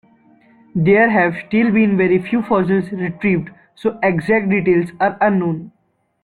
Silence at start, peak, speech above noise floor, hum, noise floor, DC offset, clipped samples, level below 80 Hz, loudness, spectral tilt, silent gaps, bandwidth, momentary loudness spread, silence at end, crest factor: 0.75 s; -2 dBFS; 35 dB; none; -51 dBFS; under 0.1%; under 0.1%; -52 dBFS; -16 LUFS; -9 dB/octave; none; 10.5 kHz; 10 LU; 0.55 s; 16 dB